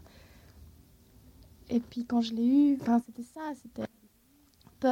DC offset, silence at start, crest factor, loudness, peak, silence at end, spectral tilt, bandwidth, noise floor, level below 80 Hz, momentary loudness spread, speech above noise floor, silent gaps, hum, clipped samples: under 0.1%; 0.6 s; 16 dB; -30 LUFS; -16 dBFS; 0 s; -6.5 dB/octave; 16 kHz; -64 dBFS; -62 dBFS; 17 LU; 36 dB; none; none; under 0.1%